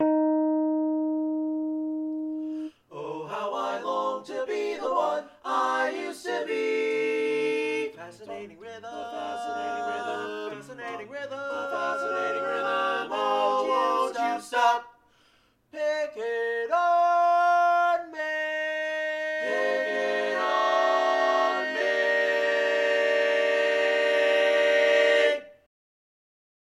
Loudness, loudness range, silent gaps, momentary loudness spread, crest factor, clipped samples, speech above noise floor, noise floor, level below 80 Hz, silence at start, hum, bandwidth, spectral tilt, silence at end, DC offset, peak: -26 LUFS; 8 LU; none; 14 LU; 16 dB; under 0.1%; 33 dB; -64 dBFS; -76 dBFS; 0 s; none; 13 kHz; -3 dB/octave; 1.15 s; under 0.1%; -10 dBFS